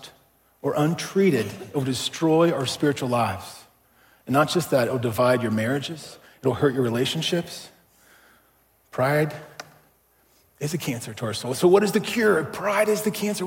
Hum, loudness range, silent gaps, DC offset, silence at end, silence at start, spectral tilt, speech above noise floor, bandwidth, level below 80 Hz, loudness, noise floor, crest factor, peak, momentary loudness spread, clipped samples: none; 6 LU; none; under 0.1%; 0 s; 0 s; -5 dB/octave; 39 dB; 17 kHz; -64 dBFS; -23 LUFS; -62 dBFS; 20 dB; -6 dBFS; 14 LU; under 0.1%